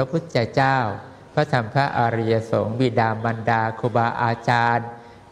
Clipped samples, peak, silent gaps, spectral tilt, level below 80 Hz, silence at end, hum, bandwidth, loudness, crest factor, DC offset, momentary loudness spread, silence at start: under 0.1%; -4 dBFS; none; -7 dB/octave; -56 dBFS; 0.1 s; none; 10 kHz; -21 LUFS; 18 dB; under 0.1%; 5 LU; 0 s